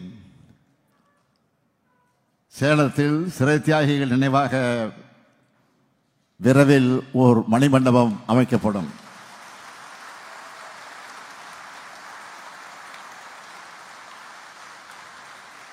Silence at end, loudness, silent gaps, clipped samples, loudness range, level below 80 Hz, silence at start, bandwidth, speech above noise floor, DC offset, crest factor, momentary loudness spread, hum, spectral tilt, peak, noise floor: 0.4 s; -19 LUFS; none; under 0.1%; 21 LU; -64 dBFS; 0 s; 15 kHz; 49 dB; under 0.1%; 22 dB; 24 LU; none; -7 dB/octave; -2 dBFS; -68 dBFS